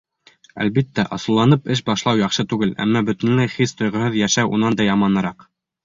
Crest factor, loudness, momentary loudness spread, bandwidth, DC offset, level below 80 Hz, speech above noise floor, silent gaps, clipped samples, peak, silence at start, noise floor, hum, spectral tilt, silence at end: 16 dB; -19 LUFS; 5 LU; 7.6 kHz; under 0.1%; -52 dBFS; 35 dB; none; under 0.1%; -2 dBFS; 0.55 s; -53 dBFS; none; -5 dB/octave; 0.45 s